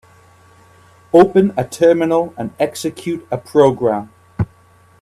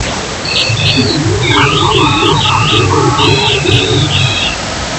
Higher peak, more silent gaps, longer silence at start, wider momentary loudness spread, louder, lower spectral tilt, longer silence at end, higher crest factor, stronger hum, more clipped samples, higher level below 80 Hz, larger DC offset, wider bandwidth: about the same, 0 dBFS vs 0 dBFS; neither; first, 1.15 s vs 0 s; first, 13 LU vs 4 LU; second, -16 LUFS vs -10 LUFS; first, -6.5 dB/octave vs -4 dB/octave; first, 0.55 s vs 0 s; first, 16 dB vs 10 dB; neither; neither; second, -48 dBFS vs -30 dBFS; neither; first, 13.5 kHz vs 11 kHz